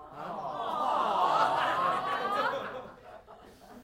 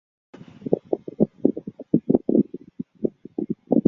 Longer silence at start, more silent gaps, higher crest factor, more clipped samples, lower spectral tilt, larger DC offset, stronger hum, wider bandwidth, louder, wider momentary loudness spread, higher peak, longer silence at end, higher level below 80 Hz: second, 0 s vs 0.65 s; neither; about the same, 18 dB vs 22 dB; neither; second, -4 dB/octave vs -12.5 dB/octave; neither; neither; first, 16 kHz vs 3.6 kHz; second, -30 LUFS vs -25 LUFS; about the same, 18 LU vs 16 LU; second, -14 dBFS vs -2 dBFS; about the same, 0 s vs 0 s; second, -66 dBFS vs -58 dBFS